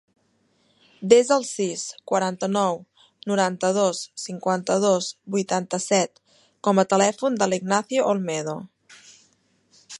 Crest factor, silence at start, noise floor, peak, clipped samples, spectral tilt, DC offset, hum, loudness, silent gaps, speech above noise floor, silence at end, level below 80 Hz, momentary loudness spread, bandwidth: 22 dB; 1 s; -66 dBFS; -2 dBFS; under 0.1%; -4 dB/octave; under 0.1%; none; -23 LUFS; none; 44 dB; 0 s; -74 dBFS; 12 LU; 11.5 kHz